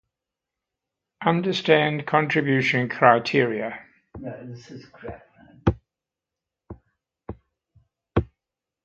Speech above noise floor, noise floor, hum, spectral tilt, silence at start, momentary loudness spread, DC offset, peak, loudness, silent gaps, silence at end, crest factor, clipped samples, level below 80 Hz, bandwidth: 65 dB; -88 dBFS; none; -6.5 dB/octave; 1.2 s; 23 LU; under 0.1%; -2 dBFS; -22 LUFS; none; 0.6 s; 24 dB; under 0.1%; -46 dBFS; 7.8 kHz